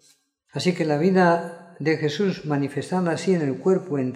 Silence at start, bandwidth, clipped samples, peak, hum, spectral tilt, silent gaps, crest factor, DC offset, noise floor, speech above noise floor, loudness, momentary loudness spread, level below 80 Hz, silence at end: 0.55 s; 11.5 kHz; under 0.1%; -4 dBFS; none; -6.5 dB/octave; none; 18 dB; under 0.1%; -61 dBFS; 39 dB; -23 LUFS; 7 LU; -70 dBFS; 0 s